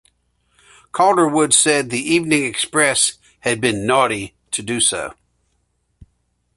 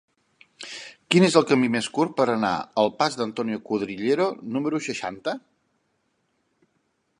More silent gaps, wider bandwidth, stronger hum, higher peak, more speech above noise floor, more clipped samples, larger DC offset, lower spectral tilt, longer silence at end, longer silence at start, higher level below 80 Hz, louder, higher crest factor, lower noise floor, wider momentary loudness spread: neither; about the same, 12 kHz vs 11.5 kHz; first, 60 Hz at -50 dBFS vs none; about the same, 0 dBFS vs -2 dBFS; about the same, 50 dB vs 49 dB; neither; neither; second, -2.5 dB/octave vs -5 dB/octave; second, 1.45 s vs 1.8 s; first, 0.95 s vs 0.6 s; first, -54 dBFS vs -68 dBFS; first, -17 LUFS vs -23 LUFS; about the same, 20 dB vs 22 dB; second, -67 dBFS vs -72 dBFS; second, 12 LU vs 18 LU